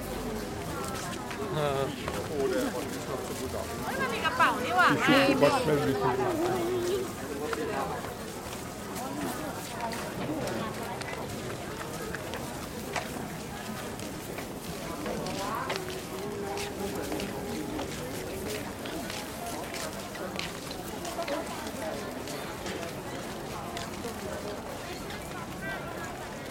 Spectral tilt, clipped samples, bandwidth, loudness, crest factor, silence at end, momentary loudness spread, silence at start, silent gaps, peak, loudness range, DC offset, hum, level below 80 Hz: -4.5 dB/octave; under 0.1%; 16.5 kHz; -32 LUFS; 24 dB; 0 s; 12 LU; 0 s; none; -8 dBFS; 11 LU; under 0.1%; none; -52 dBFS